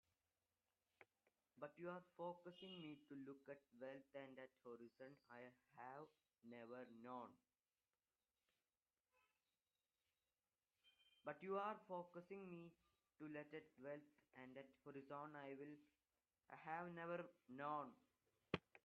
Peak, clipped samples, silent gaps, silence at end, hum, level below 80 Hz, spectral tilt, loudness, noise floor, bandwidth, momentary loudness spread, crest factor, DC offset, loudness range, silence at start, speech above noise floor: -26 dBFS; under 0.1%; none; 0.1 s; none; under -90 dBFS; -4.5 dB/octave; -57 LUFS; under -90 dBFS; 5 kHz; 12 LU; 32 dB; under 0.1%; 8 LU; 1 s; over 34 dB